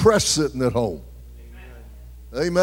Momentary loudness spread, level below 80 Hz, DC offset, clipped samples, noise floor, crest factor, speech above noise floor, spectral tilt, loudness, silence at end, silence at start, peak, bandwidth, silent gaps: 25 LU; -40 dBFS; under 0.1%; under 0.1%; -41 dBFS; 18 dB; 21 dB; -4 dB/octave; -22 LUFS; 0 s; 0 s; -4 dBFS; 16.5 kHz; none